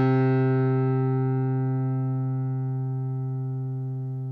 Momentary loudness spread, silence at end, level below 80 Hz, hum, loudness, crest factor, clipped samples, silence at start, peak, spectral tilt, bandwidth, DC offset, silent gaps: 8 LU; 0 s; -66 dBFS; none; -26 LUFS; 12 dB; under 0.1%; 0 s; -12 dBFS; -11.5 dB/octave; 4.2 kHz; under 0.1%; none